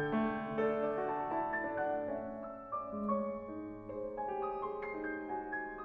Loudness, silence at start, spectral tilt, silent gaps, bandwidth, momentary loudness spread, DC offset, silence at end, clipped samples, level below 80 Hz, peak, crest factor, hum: -38 LUFS; 0 s; -9 dB/octave; none; 4.7 kHz; 9 LU; under 0.1%; 0 s; under 0.1%; -64 dBFS; -22 dBFS; 16 dB; none